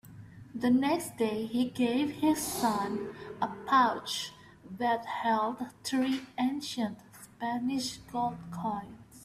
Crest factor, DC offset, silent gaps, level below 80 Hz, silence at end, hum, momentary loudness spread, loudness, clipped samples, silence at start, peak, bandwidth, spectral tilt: 18 dB; under 0.1%; none; -66 dBFS; 0 s; none; 13 LU; -31 LUFS; under 0.1%; 0.05 s; -14 dBFS; 15.5 kHz; -4 dB/octave